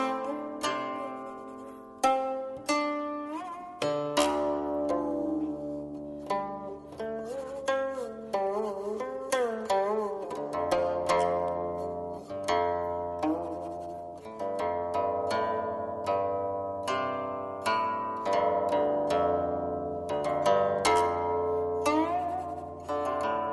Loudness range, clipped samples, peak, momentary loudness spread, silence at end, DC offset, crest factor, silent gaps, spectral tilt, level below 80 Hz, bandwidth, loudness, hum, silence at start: 5 LU; under 0.1%; -12 dBFS; 11 LU; 0 s; under 0.1%; 18 dB; none; -4.5 dB/octave; -60 dBFS; 12 kHz; -31 LUFS; none; 0 s